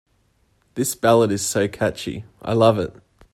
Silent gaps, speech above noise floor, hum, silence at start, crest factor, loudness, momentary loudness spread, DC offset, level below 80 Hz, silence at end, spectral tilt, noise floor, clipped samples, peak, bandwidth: none; 43 dB; none; 0.75 s; 20 dB; -20 LUFS; 14 LU; under 0.1%; -54 dBFS; 0.4 s; -5 dB/octave; -63 dBFS; under 0.1%; -2 dBFS; 16 kHz